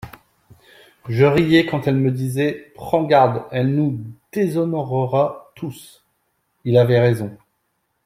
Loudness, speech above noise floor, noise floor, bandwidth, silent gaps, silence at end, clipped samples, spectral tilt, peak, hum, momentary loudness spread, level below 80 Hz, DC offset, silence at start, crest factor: -18 LUFS; 53 dB; -70 dBFS; 15.5 kHz; none; 0.7 s; under 0.1%; -7.5 dB/octave; -2 dBFS; none; 17 LU; -54 dBFS; under 0.1%; 0.05 s; 18 dB